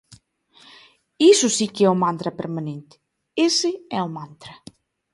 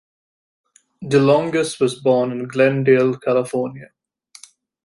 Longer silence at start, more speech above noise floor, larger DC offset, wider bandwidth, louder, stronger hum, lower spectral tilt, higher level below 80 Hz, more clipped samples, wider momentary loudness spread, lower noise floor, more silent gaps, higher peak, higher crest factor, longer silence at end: first, 1.2 s vs 1 s; first, 35 dB vs 30 dB; neither; about the same, 11.5 kHz vs 11.5 kHz; about the same, -20 LUFS vs -18 LUFS; neither; second, -4 dB/octave vs -6 dB/octave; about the same, -66 dBFS vs -62 dBFS; neither; first, 22 LU vs 9 LU; first, -55 dBFS vs -47 dBFS; neither; about the same, -4 dBFS vs -2 dBFS; about the same, 18 dB vs 18 dB; second, 0.6 s vs 1 s